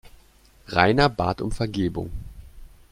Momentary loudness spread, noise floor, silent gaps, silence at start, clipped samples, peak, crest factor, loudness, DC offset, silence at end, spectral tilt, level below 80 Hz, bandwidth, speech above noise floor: 18 LU; -54 dBFS; none; 0.05 s; under 0.1%; -2 dBFS; 24 dB; -23 LUFS; under 0.1%; 0.25 s; -6.5 dB/octave; -40 dBFS; 15.5 kHz; 32 dB